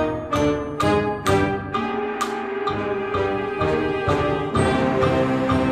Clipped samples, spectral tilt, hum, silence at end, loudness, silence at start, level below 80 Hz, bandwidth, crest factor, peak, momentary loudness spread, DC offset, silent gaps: under 0.1%; -6 dB/octave; none; 0 s; -22 LUFS; 0 s; -42 dBFS; 15 kHz; 16 dB; -4 dBFS; 5 LU; under 0.1%; none